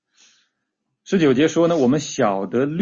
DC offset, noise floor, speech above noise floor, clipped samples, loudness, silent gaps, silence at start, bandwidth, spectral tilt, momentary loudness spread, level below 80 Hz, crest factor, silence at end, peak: under 0.1%; -76 dBFS; 59 dB; under 0.1%; -19 LUFS; none; 1.1 s; 7.6 kHz; -5.5 dB/octave; 5 LU; -58 dBFS; 14 dB; 0 s; -6 dBFS